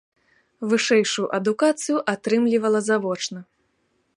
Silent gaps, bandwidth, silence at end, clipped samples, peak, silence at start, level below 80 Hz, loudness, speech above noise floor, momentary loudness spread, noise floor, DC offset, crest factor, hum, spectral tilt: none; 11.5 kHz; 0.75 s; under 0.1%; -6 dBFS; 0.6 s; -74 dBFS; -22 LUFS; 48 dB; 9 LU; -69 dBFS; under 0.1%; 16 dB; none; -4 dB/octave